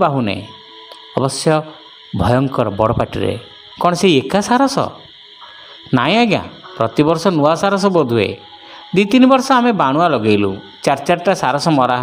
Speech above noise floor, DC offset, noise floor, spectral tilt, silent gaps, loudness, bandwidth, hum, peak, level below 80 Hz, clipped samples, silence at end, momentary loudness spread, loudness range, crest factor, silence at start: 25 dB; under 0.1%; -39 dBFS; -5.5 dB/octave; none; -15 LUFS; 16 kHz; none; 0 dBFS; -44 dBFS; under 0.1%; 0 s; 20 LU; 4 LU; 16 dB; 0 s